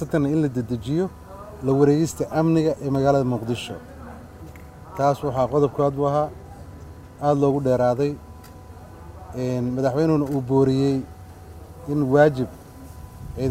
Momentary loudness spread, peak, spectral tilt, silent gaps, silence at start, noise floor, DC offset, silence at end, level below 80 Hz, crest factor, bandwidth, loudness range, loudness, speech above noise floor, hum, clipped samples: 23 LU; -2 dBFS; -7.5 dB/octave; none; 0 s; -41 dBFS; under 0.1%; 0 s; -48 dBFS; 20 dB; 15.5 kHz; 3 LU; -22 LUFS; 21 dB; none; under 0.1%